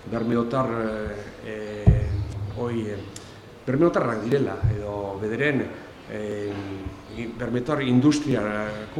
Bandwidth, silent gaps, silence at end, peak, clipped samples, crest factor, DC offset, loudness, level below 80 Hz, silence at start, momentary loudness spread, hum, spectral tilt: 12 kHz; none; 0 s; -2 dBFS; under 0.1%; 22 dB; under 0.1%; -25 LUFS; -38 dBFS; 0 s; 15 LU; none; -7 dB/octave